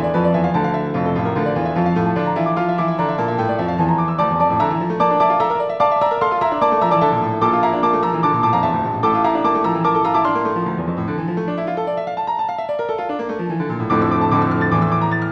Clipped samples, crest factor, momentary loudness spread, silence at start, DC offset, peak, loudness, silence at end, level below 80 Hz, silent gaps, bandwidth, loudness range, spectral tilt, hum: under 0.1%; 14 dB; 6 LU; 0 s; 0.2%; -2 dBFS; -18 LUFS; 0 s; -48 dBFS; none; 6.4 kHz; 4 LU; -9 dB/octave; none